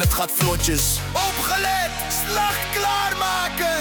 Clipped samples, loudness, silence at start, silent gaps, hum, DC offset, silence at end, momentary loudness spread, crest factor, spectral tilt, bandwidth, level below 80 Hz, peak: under 0.1%; -21 LUFS; 0 s; none; none; under 0.1%; 0 s; 3 LU; 16 dB; -2.5 dB/octave; over 20 kHz; -32 dBFS; -6 dBFS